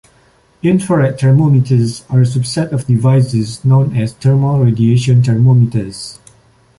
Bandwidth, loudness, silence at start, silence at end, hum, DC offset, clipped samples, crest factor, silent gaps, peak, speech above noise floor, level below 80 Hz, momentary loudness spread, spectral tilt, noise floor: 11.5 kHz; -12 LUFS; 0.65 s; 0.65 s; none; under 0.1%; under 0.1%; 10 dB; none; -2 dBFS; 39 dB; -44 dBFS; 7 LU; -7.5 dB/octave; -51 dBFS